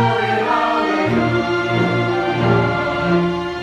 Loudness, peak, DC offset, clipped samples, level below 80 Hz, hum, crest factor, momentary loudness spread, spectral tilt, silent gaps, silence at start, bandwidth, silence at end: -17 LUFS; -2 dBFS; under 0.1%; under 0.1%; -44 dBFS; none; 14 dB; 2 LU; -7 dB/octave; none; 0 s; 10 kHz; 0 s